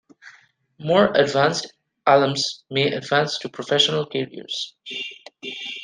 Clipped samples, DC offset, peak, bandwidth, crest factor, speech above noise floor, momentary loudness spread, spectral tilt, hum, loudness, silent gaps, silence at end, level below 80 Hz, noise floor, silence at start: under 0.1%; under 0.1%; -2 dBFS; 10 kHz; 20 dB; 34 dB; 14 LU; -4 dB/octave; none; -21 LUFS; none; 0 s; -64 dBFS; -55 dBFS; 0.25 s